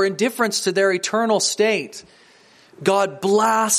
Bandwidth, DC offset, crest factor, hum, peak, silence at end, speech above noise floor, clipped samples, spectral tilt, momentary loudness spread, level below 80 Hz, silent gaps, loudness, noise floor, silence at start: 15.5 kHz; under 0.1%; 18 dB; none; -2 dBFS; 0 s; 32 dB; under 0.1%; -2.5 dB/octave; 7 LU; -72 dBFS; none; -19 LUFS; -51 dBFS; 0 s